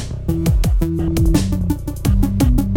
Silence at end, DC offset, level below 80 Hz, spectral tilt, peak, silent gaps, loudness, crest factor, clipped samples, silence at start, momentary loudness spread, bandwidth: 0 s; under 0.1%; -20 dBFS; -7 dB/octave; -2 dBFS; none; -18 LUFS; 14 dB; under 0.1%; 0 s; 5 LU; 17 kHz